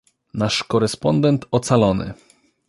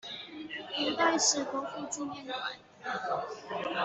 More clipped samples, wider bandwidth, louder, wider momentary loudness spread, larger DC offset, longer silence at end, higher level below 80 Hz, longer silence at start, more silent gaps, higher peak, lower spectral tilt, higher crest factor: neither; first, 11.5 kHz vs 8.2 kHz; first, -19 LUFS vs -32 LUFS; second, 9 LU vs 15 LU; neither; first, 0.55 s vs 0 s; first, -46 dBFS vs -76 dBFS; first, 0.35 s vs 0.05 s; neither; first, -2 dBFS vs -12 dBFS; first, -6 dB/octave vs -1 dB/octave; about the same, 18 dB vs 20 dB